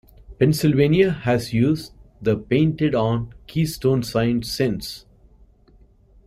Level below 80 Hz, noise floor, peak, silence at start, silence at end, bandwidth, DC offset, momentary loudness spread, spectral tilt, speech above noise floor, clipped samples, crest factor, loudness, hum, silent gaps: -46 dBFS; -53 dBFS; -4 dBFS; 0.3 s; 1.3 s; 15.5 kHz; under 0.1%; 10 LU; -6.5 dB/octave; 33 dB; under 0.1%; 16 dB; -21 LUFS; none; none